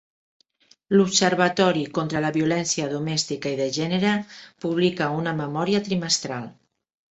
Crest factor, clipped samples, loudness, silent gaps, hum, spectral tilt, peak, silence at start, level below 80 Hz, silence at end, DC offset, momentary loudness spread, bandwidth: 22 dB; under 0.1%; -23 LUFS; none; none; -4 dB/octave; -2 dBFS; 0.9 s; -62 dBFS; 0.6 s; under 0.1%; 8 LU; 8.4 kHz